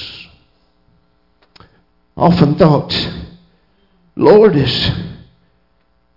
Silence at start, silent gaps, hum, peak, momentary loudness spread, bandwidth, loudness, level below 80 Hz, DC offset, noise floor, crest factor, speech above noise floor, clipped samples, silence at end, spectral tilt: 0 s; none; 60 Hz at -45 dBFS; 0 dBFS; 23 LU; 5.8 kHz; -12 LUFS; -40 dBFS; under 0.1%; -60 dBFS; 16 dB; 49 dB; under 0.1%; 1 s; -8 dB/octave